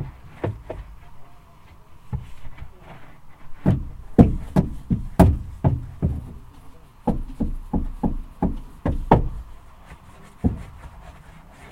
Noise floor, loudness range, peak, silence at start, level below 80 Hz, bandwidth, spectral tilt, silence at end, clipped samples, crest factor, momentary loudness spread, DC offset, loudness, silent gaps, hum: -46 dBFS; 10 LU; 0 dBFS; 0 s; -32 dBFS; 16.5 kHz; -9 dB/octave; 0 s; under 0.1%; 24 dB; 26 LU; under 0.1%; -24 LUFS; none; none